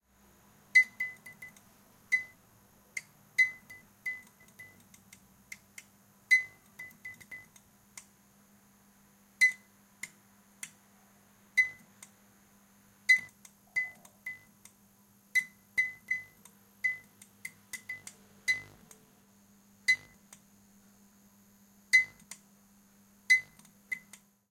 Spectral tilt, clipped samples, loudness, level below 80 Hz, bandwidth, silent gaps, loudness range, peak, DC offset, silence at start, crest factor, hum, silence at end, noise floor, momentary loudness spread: 0.5 dB/octave; under 0.1%; -30 LUFS; -78 dBFS; 16.5 kHz; none; 6 LU; -12 dBFS; under 0.1%; 0.75 s; 24 dB; none; 0.55 s; -64 dBFS; 26 LU